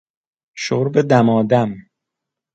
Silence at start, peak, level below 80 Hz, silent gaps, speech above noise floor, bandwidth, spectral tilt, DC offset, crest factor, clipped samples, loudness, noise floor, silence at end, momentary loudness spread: 0.55 s; 0 dBFS; -60 dBFS; none; 67 dB; 8 kHz; -7 dB/octave; under 0.1%; 18 dB; under 0.1%; -17 LUFS; -83 dBFS; 0.75 s; 12 LU